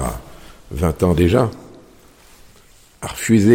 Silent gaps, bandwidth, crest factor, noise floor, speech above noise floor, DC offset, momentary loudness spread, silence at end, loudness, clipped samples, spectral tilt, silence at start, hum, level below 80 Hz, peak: none; 17 kHz; 18 dB; -48 dBFS; 34 dB; under 0.1%; 18 LU; 0 s; -18 LUFS; under 0.1%; -6.5 dB/octave; 0 s; none; -34 dBFS; -2 dBFS